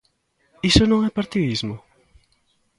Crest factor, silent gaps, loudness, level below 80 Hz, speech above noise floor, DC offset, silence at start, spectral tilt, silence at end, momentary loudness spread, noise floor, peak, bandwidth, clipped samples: 22 dB; none; -20 LUFS; -36 dBFS; 47 dB; under 0.1%; 0.65 s; -5 dB/octave; 1 s; 14 LU; -66 dBFS; 0 dBFS; 11.5 kHz; under 0.1%